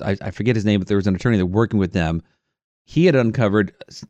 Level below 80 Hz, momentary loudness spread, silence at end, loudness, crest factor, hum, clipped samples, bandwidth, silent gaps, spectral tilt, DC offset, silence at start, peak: -48 dBFS; 9 LU; 0.05 s; -19 LUFS; 16 dB; none; under 0.1%; 8.2 kHz; 2.64-2.85 s; -7.5 dB/octave; under 0.1%; 0 s; -4 dBFS